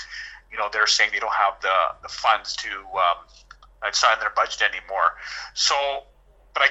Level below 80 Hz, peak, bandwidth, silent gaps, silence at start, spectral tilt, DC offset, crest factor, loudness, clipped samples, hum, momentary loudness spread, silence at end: -54 dBFS; -4 dBFS; 8.2 kHz; none; 0 s; 1.5 dB/octave; under 0.1%; 20 dB; -22 LUFS; under 0.1%; none; 12 LU; 0 s